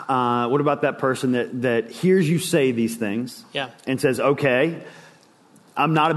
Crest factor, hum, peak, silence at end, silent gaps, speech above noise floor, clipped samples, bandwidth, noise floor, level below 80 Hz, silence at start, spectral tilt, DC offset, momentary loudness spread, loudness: 16 dB; none; -6 dBFS; 0 s; none; 32 dB; under 0.1%; 12.5 kHz; -53 dBFS; -66 dBFS; 0 s; -6 dB/octave; under 0.1%; 10 LU; -21 LUFS